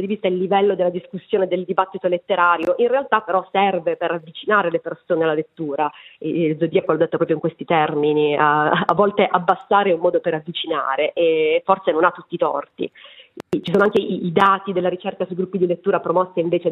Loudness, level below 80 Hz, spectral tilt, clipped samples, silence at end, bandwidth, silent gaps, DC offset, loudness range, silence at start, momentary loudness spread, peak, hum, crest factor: -19 LUFS; -66 dBFS; -7.5 dB/octave; under 0.1%; 0 s; 6.4 kHz; none; under 0.1%; 3 LU; 0 s; 8 LU; 0 dBFS; none; 18 dB